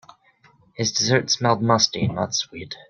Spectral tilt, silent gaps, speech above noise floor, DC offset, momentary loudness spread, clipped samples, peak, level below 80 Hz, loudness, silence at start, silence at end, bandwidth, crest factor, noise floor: -3.5 dB/octave; none; 35 dB; under 0.1%; 7 LU; under 0.1%; -2 dBFS; -58 dBFS; -20 LUFS; 0.8 s; 0.15 s; 10.5 kHz; 22 dB; -57 dBFS